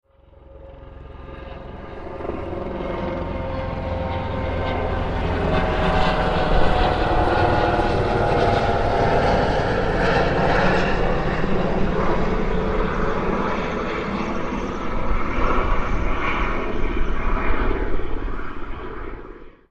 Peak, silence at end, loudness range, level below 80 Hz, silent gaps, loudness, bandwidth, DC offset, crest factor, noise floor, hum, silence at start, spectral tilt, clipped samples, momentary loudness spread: -4 dBFS; 0.2 s; 8 LU; -26 dBFS; none; -22 LUFS; 7.8 kHz; under 0.1%; 16 dB; -48 dBFS; none; 0.5 s; -7 dB/octave; under 0.1%; 15 LU